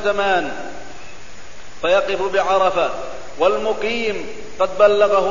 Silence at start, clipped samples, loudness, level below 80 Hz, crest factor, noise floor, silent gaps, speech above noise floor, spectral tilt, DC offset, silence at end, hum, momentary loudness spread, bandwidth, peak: 0 s; under 0.1%; -18 LUFS; -46 dBFS; 18 dB; -39 dBFS; none; 21 dB; -3.5 dB/octave; 4%; 0 s; none; 19 LU; 7.4 kHz; 0 dBFS